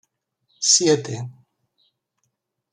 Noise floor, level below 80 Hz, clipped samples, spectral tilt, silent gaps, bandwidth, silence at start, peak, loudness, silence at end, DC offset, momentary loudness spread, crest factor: -75 dBFS; -70 dBFS; under 0.1%; -2.5 dB/octave; none; 11.5 kHz; 0.6 s; -4 dBFS; -17 LUFS; 1.4 s; under 0.1%; 18 LU; 22 dB